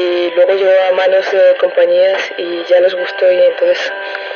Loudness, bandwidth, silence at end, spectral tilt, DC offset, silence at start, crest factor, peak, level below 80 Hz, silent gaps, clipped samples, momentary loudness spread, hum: -12 LUFS; 6.8 kHz; 0 s; -3 dB/octave; under 0.1%; 0 s; 12 dB; 0 dBFS; -84 dBFS; none; under 0.1%; 7 LU; none